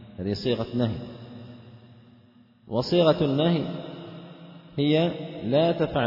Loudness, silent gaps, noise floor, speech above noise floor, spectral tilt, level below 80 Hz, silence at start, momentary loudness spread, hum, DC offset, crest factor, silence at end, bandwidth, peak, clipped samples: -25 LUFS; none; -56 dBFS; 32 dB; -8 dB/octave; -56 dBFS; 0 s; 22 LU; none; under 0.1%; 20 dB; 0 s; 5.8 kHz; -6 dBFS; under 0.1%